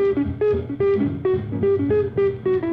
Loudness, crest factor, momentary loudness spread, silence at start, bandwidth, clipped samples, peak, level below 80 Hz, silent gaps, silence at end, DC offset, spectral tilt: -21 LUFS; 10 dB; 3 LU; 0 s; 4.6 kHz; under 0.1%; -10 dBFS; -42 dBFS; none; 0 s; under 0.1%; -10.5 dB/octave